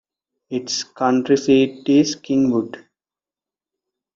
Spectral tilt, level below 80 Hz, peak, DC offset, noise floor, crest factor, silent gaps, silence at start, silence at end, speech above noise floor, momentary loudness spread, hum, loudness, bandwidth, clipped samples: -5 dB/octave; -62 dBFS; -4 dBFS; under 0.1%; under -90 dBFS; 16 dB; none; 0.5 s; 1.4 s; over 72 dB; 11 LU; none; -19 LUFS; 7.6 kHz; under 0.1%